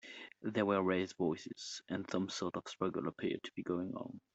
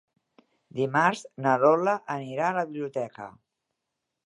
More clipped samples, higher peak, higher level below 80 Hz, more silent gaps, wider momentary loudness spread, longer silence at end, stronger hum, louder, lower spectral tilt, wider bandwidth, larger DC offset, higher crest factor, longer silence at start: neither; second, -20 dBFS vs -6 dBFS; about the same, -76 dBFS vs -78 dBFS; neither; second, 11 LU vs 16 LU; second, 0.15 s vs 0.95 s; neither; second, -39 LUFS vs -26 LUFS; about the same, -5.5 dB/octave vs -6 dB/octave; second, 8.2 kHz vs 11 kHz; neither; about the same, 18 dB vs 22 dB; second, 0.05 s vs 0.75 s